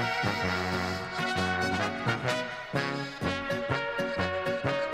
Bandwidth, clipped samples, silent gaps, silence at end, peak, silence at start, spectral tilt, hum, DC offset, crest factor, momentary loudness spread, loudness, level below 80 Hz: 16 kHz; under 0.1%; none; 0 s; -14 dBFS; 0 s; -5 dB/octave; none; under 0.1%; 16 dB; 4 LU; -30 LUFS; -56 dBFS